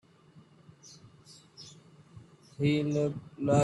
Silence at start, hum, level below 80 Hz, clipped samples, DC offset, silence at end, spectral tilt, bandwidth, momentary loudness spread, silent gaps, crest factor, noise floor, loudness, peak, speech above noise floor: 1.6 s; none; -64 dBFS; under 0.1%; under 0.1%; 0 s; -7 dB/octave; 11.5 kHz; 26 LU; none; 20 dB; -59 dBFS; -30 LUFS; -14 dBFS; 31 dB